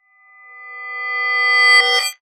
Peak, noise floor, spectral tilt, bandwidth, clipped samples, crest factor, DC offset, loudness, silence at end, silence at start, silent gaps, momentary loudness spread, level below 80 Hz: -2 dBFS; -47 dBFS; 5.5 dB/octave; over 20 kHz; under 0.1%; 16 dB; under 0.1%; -13 LUFS; 0.1 s; 0.5 s; none; 20 LU; -86 dBFS